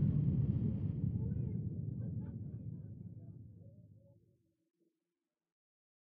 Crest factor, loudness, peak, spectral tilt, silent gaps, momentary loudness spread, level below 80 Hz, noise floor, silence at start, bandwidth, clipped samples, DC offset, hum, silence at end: 18 dB; -39 LUFS; -22 dBFS; -13.5 dB/octave; none; 20 LU; -54 dBFS; under -90 dBFS; 0 s; 2.4 kHz; under 0.1%; under 0.1%; none; 2.15 s